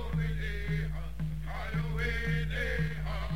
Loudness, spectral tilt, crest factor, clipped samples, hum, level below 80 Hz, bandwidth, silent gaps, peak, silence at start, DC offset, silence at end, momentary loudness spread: -34 LUFS; -6.5 dB/octave; 12 dB; under 0.1%; none; -38 dBFS; 16 kHz; none; -20 dBFS; 0 s; 0.9%; 0 s; 6 LU